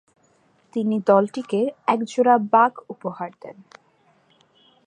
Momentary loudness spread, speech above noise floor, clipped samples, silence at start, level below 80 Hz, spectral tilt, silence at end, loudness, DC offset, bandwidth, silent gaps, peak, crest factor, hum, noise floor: 17 LU; 40 dB; under 0.1%; 0.75 s; -78 dBFS; -6.5 dB/octave; 1.35 s; -21 LUFS; under 0.1%; 9.6 kHz; none; -4 dBFS; 20 dB; none; -61 dBFS